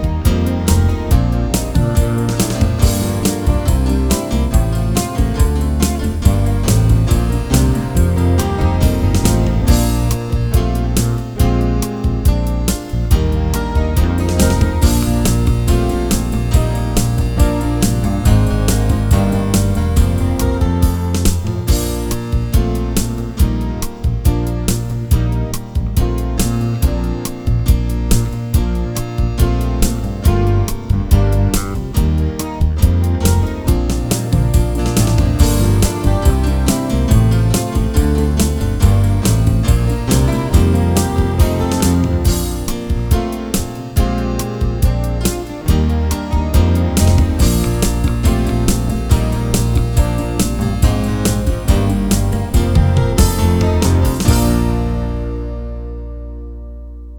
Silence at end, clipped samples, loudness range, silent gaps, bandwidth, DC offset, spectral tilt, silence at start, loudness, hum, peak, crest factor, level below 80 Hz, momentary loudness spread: 0 s; under 0.1%; 3 LU; none; over 20 kHz; under 0.1%; -6 dB/octave; 0 s; -16 LUFS; none; 0 dBFS; 14 dB; -18 dBFS; 6 LU